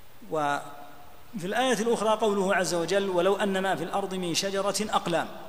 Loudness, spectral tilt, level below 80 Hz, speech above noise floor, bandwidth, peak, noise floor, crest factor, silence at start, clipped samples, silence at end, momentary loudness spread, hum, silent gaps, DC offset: -27 LUFS; -4 dB/octave; -62 dBFS; 23 dB; 15.5 kHz; -12 dBFS; -50 dBFS; 16 dB; 0.2 s; under 0.1%; 0 s; 9 LU; none; none; 0.7%